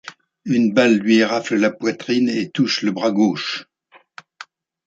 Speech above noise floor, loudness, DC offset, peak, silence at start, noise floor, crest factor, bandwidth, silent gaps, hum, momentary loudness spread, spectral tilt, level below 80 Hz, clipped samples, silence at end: 36 dB; -18 LUFS; under 0.1%; -2 dBFS; 0.05 s; -54 dBFS; 18 dB; 7.8 kHz; none; none; 13 LU; -5 dB/octave; -66 dBFS; under 0.1%; 0.45 s